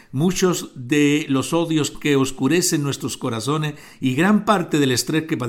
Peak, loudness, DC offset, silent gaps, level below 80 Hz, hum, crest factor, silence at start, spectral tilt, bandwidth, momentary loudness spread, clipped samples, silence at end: -4 dBFS; -20 LUFS; under 0.1%; none; -50 dBFS; none; 16 dB; 0.1 s; -4.5 dB/octave; 17 kHz; 7 LU; under 0.1%; 0 s